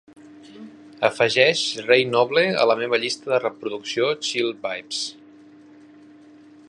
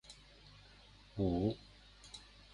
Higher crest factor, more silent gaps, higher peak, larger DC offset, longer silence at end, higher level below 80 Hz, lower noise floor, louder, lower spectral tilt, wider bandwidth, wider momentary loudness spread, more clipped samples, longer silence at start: about the same, 22 dB vs 20 dB; neither; first, -2 dBFS vs -22 dBFS; neither; first, 1.55 s vs 0.3 s; second, -72 dBFS vs -56 dBFS; second, -48 dBFS vs -61 dBFS; first, -21 LUFS vs -39 LUFS; second, -3 dB/octave vs -7.5 dB/octave; about the same, 11.5 kHz vs 11 kHz; second, 12 LU vs 24 LU; neither; first, 0.35 s vs 0.1 s